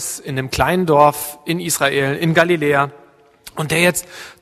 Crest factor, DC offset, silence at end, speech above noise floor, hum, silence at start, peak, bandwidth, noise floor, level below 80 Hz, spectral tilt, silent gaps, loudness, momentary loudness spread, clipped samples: 18 dB; under 0.1%; 0.1 s; 27 dB; none; 0 s; 0 dBFS; 14 kHz; -44 dBFS; -44 dBFS; -4 dB/octave; none; -17 LUFS; 12 LU; under 0.1%